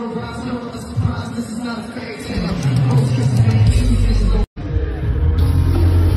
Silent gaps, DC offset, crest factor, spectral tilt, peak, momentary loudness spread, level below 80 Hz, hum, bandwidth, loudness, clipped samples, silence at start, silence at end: 4.47-4.56 s; under 0.1%; 12 dB; -7.5 dB/octave; -4 dBFS; 11 LU; -22 dBFS; none; 12.5 kHz; -18 LUFS; under 0.1%; 0 s; 0 s